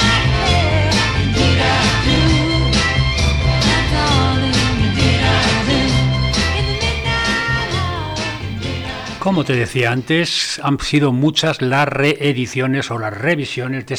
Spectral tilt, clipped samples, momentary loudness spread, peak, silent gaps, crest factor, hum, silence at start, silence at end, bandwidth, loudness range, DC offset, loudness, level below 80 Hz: -5 dB/octave; under 0.1%; 8 LU; -2 dBFS; none; 14 dB; none; 0 s; 0 s; 12.5 kHz; 4 LU; under 0.1%; -16 LUFS; -26 dBFS